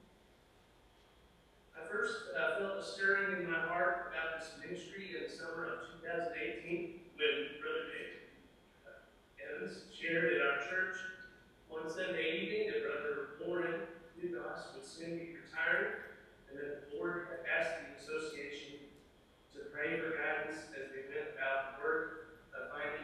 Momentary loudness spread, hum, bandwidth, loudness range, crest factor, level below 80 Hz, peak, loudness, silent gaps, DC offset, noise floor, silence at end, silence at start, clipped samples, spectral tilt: 16 LU; none; 13 kHz; 5 LU; 20 dB; -72 dBFS; -20 dBFS; -39 LUFS; none; under 0.1%; -66 dBFS; 0 s; 0.85 s; under 0.1%; -4 dB/octave